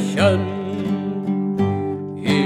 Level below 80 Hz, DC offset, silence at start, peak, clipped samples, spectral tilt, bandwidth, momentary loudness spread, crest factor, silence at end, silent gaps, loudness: -60 dBFS; under 0.1%; 0 s; -4 dBFS; under 0.1%; -6.5 dB/octave; 11.5 kHz; 8 LU; 16 dB; 0 s; none; -21 LUFS